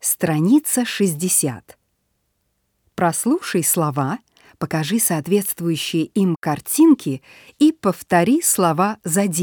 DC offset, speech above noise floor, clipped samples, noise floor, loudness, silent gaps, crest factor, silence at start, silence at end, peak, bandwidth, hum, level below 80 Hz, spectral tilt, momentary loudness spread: under 0.1%; 51 dB; under 0.1%; -70 dBFS; -18 LUFS; 6.36-6.42 s; 18 dB; 0.05 s; 0 s; -2 dBFS; over 20 kHz; none; -62 dBFS; -4.5 dB/octave; 10 LU